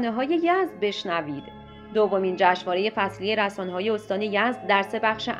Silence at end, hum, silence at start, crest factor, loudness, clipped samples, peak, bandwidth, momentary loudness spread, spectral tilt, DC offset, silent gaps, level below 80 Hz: 0 s; none; 0 s; 20 dB; -24 LUFS; under 0.1%; -4 dBFS; 12.5 kHz; 7 LU; -5.5 dB/octave; under 0.1%; none; -60 dBFS